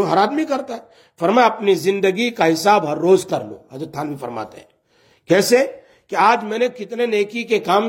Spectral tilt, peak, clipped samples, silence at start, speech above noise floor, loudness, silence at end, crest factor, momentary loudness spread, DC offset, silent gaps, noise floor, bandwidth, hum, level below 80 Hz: -4.5 dB/octave; -2 dBFS; under 0.1%; 0 s; 40 dB; -18 LUFS; 0 s; 18 dB; 15 LU; under 0.1%; none; -57 dBFS; 16.5 kHz; none; -68 dBFS